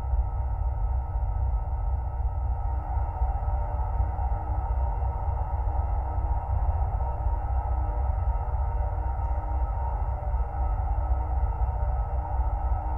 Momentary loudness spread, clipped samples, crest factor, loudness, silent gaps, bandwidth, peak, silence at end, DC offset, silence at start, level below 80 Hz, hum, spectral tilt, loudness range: 2 LU; under 0.1%; 12 dB; -30 LUFS; none; 2.9 kHz; -14 dBFS; 0 s; under 0.1%; 0 s; -28 dBFS; none; -11 dB/octave; 1 LU